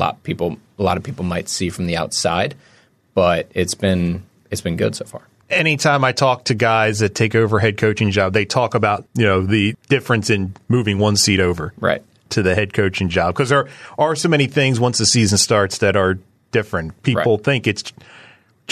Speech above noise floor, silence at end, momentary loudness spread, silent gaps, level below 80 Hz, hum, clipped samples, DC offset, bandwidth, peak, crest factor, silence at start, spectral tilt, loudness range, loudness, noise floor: 30 dB; 0.8 s; 9 LU; none; -48 dBFS; none; under 0.1%; under 0.1%; 14 kHz; -2 dBFS; 16 dB; 0 s; -4.5 dB/octave; 4 LU; -18 LUFS; -48 dBFS